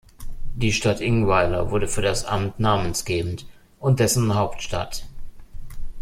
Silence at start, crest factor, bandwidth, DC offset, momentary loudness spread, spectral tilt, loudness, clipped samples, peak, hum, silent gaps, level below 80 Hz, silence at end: 0.2 s; 18 dB; 15.5 kHz; under 0.1%; 16 LU; -5 dB/octave; -22 LUFS; under 0.1%; -4 dBFS; none; none; -34 dBFS; 0 s